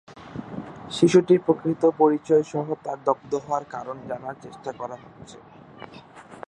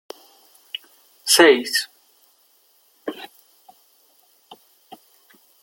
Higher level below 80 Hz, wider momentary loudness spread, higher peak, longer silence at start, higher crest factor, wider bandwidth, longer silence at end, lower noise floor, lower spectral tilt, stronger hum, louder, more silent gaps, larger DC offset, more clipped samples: first, -64 dBFS vs -74 dBFS; second, 25 LU vs 29 LU; about the same, -4 dBFS vs -2 dBFS; second, 0.1 s vs 1.25 s; about the same, 20 dB vs 24 dB; second, 10 kHz vs 17 kHz; second, 0.1 s vs 2.35 s; second, -45 dBFS vs -59 dBFS; first, -6.5 dB/octave vs -0.5 dB/octave; neither; second, -23 LUFS vs -16 LUFS; neither; neither; neither